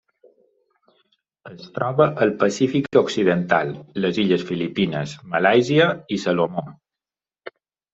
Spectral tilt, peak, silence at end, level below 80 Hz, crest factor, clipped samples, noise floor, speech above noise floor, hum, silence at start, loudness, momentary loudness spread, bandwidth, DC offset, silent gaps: -6 dB/octave; -2 dBFS; 0.45 s; -62 dBFS; 20 dB; under 0.1%; under -90 dBFS; over 70 dB; none; 1.45 s; -20 LUFS; 19 LU; 8 kHz; under 0.1%; none